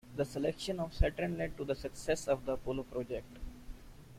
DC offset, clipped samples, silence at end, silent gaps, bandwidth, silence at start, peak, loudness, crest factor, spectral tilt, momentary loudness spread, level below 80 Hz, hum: under 0.1%; under 0.1%; 0 s; none; 16 kHz; 0.05 s; -16 dBFS; -37 LUFS; 20 dB; -5.5 dB/octave; 17 LU; -44 dBFS; none